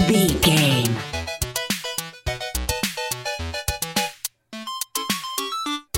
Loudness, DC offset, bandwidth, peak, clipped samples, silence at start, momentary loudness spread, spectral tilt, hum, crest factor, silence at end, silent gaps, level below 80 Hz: -23 LUFS; under 0.1%; 17 kHz; -4 dBFS; under 0.1%; 0 s; 12 LU; -3.5 dB/octave; none; 20 dB; 0 s; none; -38 dBFS